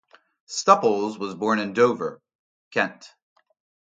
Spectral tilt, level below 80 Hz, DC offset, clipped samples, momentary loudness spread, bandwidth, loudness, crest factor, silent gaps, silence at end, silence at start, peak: -4 dB/octave; -74 dBFS; under 0.1%; under 0.1%; 12 LU; 9.2 kHz; -23 LUFS; 24 dB; 2.35-2.71 s; 0.85 s; 0.5 s; 0 dBFS